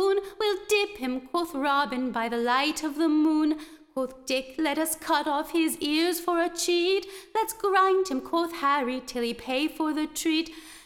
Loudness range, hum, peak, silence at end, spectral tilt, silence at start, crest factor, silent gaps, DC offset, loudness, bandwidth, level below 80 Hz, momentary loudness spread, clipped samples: 1 LU; none; -10 dBFS; 0.05 s; -2 dB/octave; 0 s; 16 dB; none; under 0.1%; -26 LUFS; 17.5 kHz; -60 dBFS; 7 LU; under 0.1%